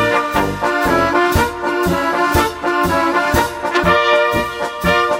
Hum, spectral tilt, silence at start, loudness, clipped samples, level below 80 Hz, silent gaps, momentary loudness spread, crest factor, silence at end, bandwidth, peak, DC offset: none; -4.5 dB/octave; 0 s; -15 LUFS; under 0.1%; -32 dBFS; none; 5 LU; 16 dB; 0 s; 16.5 kHz; 0 dBFS; under 0.1%